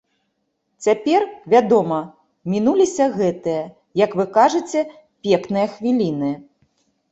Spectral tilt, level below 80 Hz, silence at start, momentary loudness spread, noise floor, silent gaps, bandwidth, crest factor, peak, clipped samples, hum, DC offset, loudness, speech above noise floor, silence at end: -6 dB/octave; -62 dBFS; 0.8 s; 11 LU; -71 dBFS; none; 8.2 kHz; 18 dB; -2 dBFS; under 0.1%; none; under 0.1%; -19 LUFS; 54 dB; 0.7 s